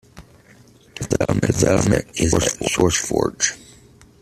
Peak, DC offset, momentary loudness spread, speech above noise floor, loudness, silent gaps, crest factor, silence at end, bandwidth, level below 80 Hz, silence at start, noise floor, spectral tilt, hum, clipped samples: -2 dBFS; under 0.1%; 8 LU; 31 dB; -19 LUFS; none; 18 dB; 0.65 s; 14.5 kHz; -40 dBFS; 0.15 s; -49 dBFS; -4.5 dB/octave; none; under 0.1%